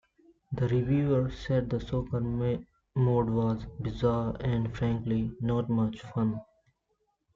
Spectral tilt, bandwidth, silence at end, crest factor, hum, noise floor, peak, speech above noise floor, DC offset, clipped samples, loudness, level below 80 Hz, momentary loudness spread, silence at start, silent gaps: -9.5 dB/octave; 7.2 kHz; 0.9 s; 16 dB; none; -77 dBFS; -14 dBFS; 48 dB; under 0.1%; under 0.1%; -30 LUFS; -48 dBFS; 6 LU; 0.5 s; none